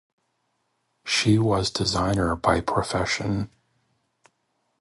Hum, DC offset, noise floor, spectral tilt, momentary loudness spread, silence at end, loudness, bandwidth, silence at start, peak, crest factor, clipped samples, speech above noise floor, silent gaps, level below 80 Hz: none; under 0.1%; -73 dBFS; -5 dB/octave; 9 LU; 1.35 s; -23 LUFS; 11.5 kHz; 1.05 s; -4 dBFS; 22 dB; under 0.1%; 50 dB; none; -44 dBFS